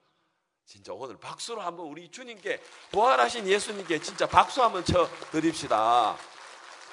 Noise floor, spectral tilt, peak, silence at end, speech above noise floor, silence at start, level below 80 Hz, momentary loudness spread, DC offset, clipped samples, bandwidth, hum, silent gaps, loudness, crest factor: -76 dBFS; -4 dB/octave; -4 dBFS; 0 s; 49 dB; 0.7 s; -58 dBFS; 20 LU; under 0.1%; under 0.1%; 11 kHz; none; none; -26 LUFS; 24 dB